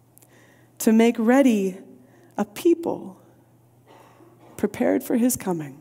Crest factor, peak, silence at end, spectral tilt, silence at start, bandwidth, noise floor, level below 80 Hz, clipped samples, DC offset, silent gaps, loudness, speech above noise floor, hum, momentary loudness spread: 18 dB; -6 dBFS; 0.05 s; -5.5 dB/octave; 0.8 s; 16 kHz; -56 dBFS; -66 dBFS; under 0.1%; under 0.1%; none; -22 LUFS; 35 dB; none; 15 LU